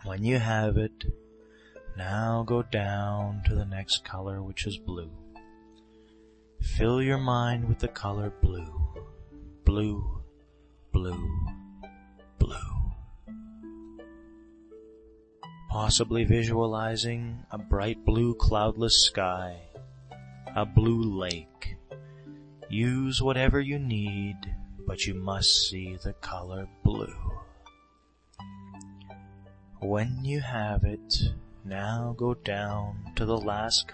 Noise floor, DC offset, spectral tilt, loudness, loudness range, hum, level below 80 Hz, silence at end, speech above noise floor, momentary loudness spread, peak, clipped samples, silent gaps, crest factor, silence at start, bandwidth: -64 dBFS; under 0.1%; -4.5 dB/octave; -29 LUFS; 10 LU; none; -36 dBFS; 0 s; 36 dB; 22 LU; -8 dBFS; under 0.1%; none; 22 dB; 0 s; 8.8 kHz